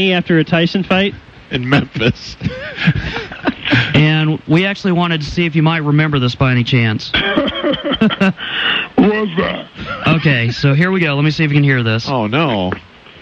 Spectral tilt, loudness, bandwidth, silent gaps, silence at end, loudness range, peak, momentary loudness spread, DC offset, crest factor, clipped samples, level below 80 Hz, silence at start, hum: -7 dB/octave; -14 LUFS; 7.2 kHz; none; 0 s; 2 LU; -2 dBFS; 8 LU; under 0.1%; 12 dB; under 0.1%; -40 dBFS; 0 s; none